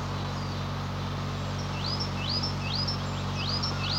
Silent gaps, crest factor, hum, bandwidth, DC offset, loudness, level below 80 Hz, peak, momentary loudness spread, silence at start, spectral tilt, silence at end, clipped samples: none; 14 dB; none; 16 kHz; under 0.1%; -31 LUFS; -44 dBFS; -16 dBFS; 4 LU; 0 s; -5 dB/octave; 0 s; under 0.1%